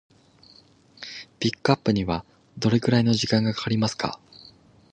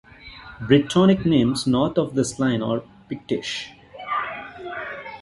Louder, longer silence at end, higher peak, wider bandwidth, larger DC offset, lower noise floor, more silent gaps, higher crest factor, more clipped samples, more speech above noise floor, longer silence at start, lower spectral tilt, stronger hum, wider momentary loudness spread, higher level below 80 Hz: about the same, -24 LUFS vs -22 LUFS; first, 0.75 s vs 0 s; about the same, -2 dBFS vs -2 dBFS; second, 9.4 kHz vs 11.5 kHz; neither; first, -55 dBFS vs -42 dBFS; neither; about the same, 24 dB vs 20 dB; neither; first, 32 dB vs 22 dB; first, 1 s vs 0.25 s; about the same, -5.5 dB/octave vs -6 dB/octave; neither; about the same, 17 LU vs 19 LU; about the same, -52 dBFS vs -50 dBFS